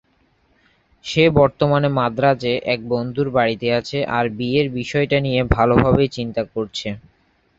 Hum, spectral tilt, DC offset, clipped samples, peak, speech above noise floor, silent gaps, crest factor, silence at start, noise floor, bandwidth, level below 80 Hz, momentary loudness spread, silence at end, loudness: none; -6.5 dB/octave; under 0.1%; under 0.1%; 0 dBFS; 43 dB; none; 18 dB; 1.05 s; -61 dBFS; 7.8 kHz; -38 dBFS; 10 LU; 0.6 s; -19 LUFS